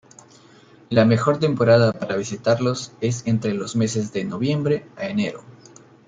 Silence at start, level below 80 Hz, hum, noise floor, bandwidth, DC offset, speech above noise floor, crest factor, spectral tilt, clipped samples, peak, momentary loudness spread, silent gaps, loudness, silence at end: 0.9 s; -60 dBFS; none; -50 dBFS; 9.4 kHz; under 0.1%; 30 dB; 18 dB; -6 dB/octave; under 0.1%; -4 dBFS; 9 LU; none; -21 LUFS; 0.55 s